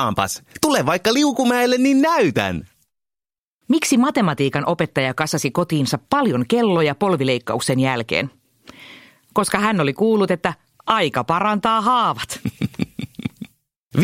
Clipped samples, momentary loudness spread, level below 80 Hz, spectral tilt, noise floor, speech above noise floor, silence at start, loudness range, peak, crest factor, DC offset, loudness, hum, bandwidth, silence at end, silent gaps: under 0.1%; 10 LU; -54 dBFS; -5 dB/octave; -89 dBFS; 71 dB; 0 s; 2 LU; 0 dBFS; 18 dB; under 0.1%; -19 LUFS; none; 16.5 kHz; 0 s; 3.38-3.61 s, 13.80-13.90 s